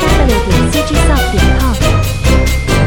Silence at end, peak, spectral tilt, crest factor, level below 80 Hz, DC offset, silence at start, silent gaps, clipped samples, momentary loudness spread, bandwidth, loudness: 0 s; 0 dBFS; -5 dB/octave; 10 dB; -14 dBFS; under 0.1%; 0 s; none; under 0.1%; 1 LU; 18.5 kHz; -12 LUFS